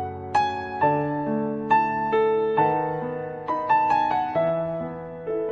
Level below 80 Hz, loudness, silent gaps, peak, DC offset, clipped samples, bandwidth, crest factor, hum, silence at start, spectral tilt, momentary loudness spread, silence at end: -58 dBFS; -24 LUFS; none; -8 dBFS; under 0.1%; under 0.1%; 7.4 kHz; 16 dB; none; 0 s; -7.5 dB/octave; 9 LU; 0 s